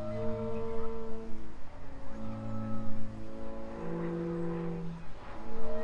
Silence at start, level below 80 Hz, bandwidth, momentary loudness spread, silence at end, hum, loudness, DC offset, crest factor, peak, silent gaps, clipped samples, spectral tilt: 0 s; -46 dBFS; 5.6 kHz; 12 LU; 0 s; none; -40 LUFS; under 0.1%; 12 dB; -16 dBFS; none; under 0.1%; -8.5 dB/octave